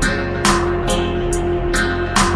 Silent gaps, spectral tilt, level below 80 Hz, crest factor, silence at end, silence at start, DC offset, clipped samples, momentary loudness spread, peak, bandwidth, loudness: none; -4 dB/octave; -26 dBFS; 16 dB; 0 s; 0 s; under 0.1%; under 0.1%; 4 LU; -2 dBFS; 11 kHz; -18 LUFS